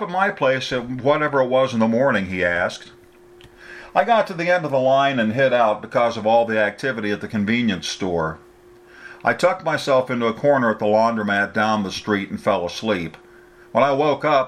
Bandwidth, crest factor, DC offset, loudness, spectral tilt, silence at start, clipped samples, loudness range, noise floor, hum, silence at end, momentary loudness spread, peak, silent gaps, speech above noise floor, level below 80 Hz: 13 kHz; 16 dB; under 0.1%; -20 LUFS; -5.5 dB/octave; 0 s; under 0.1%; 3 LU; -47 dBFS; none; 0 s; 7 LU; -4 dBFS; none; 28 dB; -56 dBFS